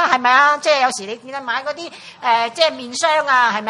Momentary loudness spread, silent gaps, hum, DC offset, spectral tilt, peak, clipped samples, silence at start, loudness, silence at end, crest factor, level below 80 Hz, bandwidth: 15 LU; none; none; under 0.1%; -1 dB/octave; 0 dBFS; under 0.1%; 0 s; -16 LUFS; 0 s; 18 dB; -70 dBFS; 11.5 kHz